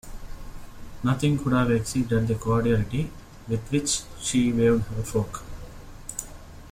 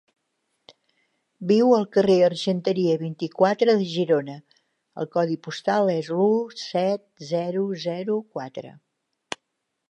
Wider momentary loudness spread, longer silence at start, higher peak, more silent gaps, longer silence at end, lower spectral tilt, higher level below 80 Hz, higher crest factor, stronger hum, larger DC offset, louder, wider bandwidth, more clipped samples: first, 22 LU vs 18 LU; second, 0.05 s vs 1.4 s; second, -10 dBFS vs -6 dBFS; neither; second, 0 s vs 1.2 s; about the same, -5.5 dB/octave vs -6.5 dB/octave; first, -40 dBFS vs -72 dBFS; about the same, 16 dB vs 18 dB; neither; neither; about the same, -25 LUFS vs -23 LUFS; first, 16 kHz vs 9.6 kHz; neither